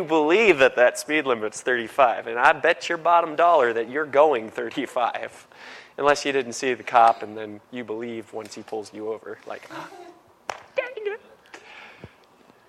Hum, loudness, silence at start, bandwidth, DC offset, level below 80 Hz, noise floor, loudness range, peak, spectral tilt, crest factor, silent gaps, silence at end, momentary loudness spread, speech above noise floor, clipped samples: none; -22 LUFS; 0 s; 14 kHz; under 0.1%; -66 dBFS; -55 dBFS; 15 LU; -4 dBFS; -3.5 dB/octave; 20 dB; none; 0.6 s; 20 LU; 33 dB; under 0.1%